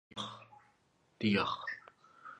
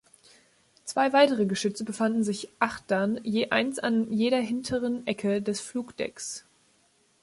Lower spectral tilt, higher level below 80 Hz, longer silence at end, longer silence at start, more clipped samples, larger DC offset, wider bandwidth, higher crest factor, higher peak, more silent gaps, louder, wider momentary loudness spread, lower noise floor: about the same, -5.5 dB/octave vs -4.5 dB/octave; second, -70 dBFS vs -64 dBFS; second, 0 s vs 0.8 s; second, 0.15 s vs 0.85 s; neither; neither; second, 9.8 kHz vs 11.5 kHz; about the same, 20 dB vs 20 dB; second, -18 dBFS vs -8 dBFS; neither; second, -36 LUFS vs -27 LUFS; first, 21 LU vs 11 LU; first, -73 dBFS vs -66 dBFS